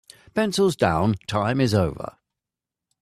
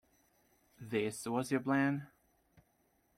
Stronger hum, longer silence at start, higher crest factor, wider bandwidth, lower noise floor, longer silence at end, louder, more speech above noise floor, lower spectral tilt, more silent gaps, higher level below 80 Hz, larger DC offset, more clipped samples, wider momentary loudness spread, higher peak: neither; second, 0.35 s vs 0.8 s; about the same, 20 dB vs 18 dB; about the same, 14.5 kHz vs 15 kHz; first, -88 dBFS vs -75 dBFS; second, 0.9 s vs 1.1 s; first, -22 LUFS vs -36 LUFS; first, 66 dB vs 40 dB; about the same, -6 dB/octave vs -5.5 dB/octave; neither; first, -50 dBFS vs -76 dBFS; neither; neither; about the same, 10 LU vs 9 LU; first, -4 dBFS vs -20 dBFS